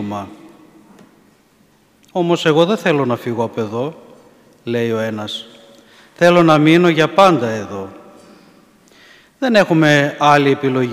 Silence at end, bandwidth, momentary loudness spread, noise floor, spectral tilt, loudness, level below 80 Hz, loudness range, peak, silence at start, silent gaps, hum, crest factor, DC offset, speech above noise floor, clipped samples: 0 s; 15.5 kHz; 16 LU; -54 dBFS; -6 dB/octave; -14 LUFS; -60 dBFS; 5 LU; 0 dBFS; 0 s; none; none; 16 dB; under 0.1%; 39 dB; under 0.1%